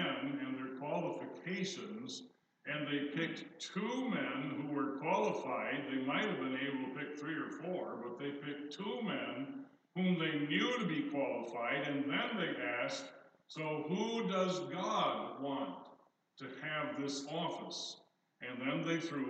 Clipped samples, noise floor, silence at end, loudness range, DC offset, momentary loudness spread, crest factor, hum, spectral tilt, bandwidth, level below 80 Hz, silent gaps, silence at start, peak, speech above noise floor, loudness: under 0.1%; -65 dBFS; 0 s; 4 LU; under 0.1%; 10 LU; 18 dB; none; -5 dB/octave; 8.8 kHz; under -90 dBFS; none; 0 s; -20 dBFS; 27 dB; -39 LUFS